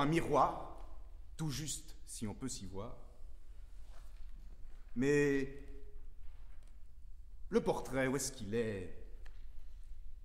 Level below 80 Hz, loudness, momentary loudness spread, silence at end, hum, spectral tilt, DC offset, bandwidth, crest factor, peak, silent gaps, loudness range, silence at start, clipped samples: -50 dBFS; -37 LUFS; 26 LU; 0 s; none; -5 dB/octave; under 0.1%; 16 kHz; 20 dB; -18 dBFS; none; 7 LU; 0 s; under 0.1%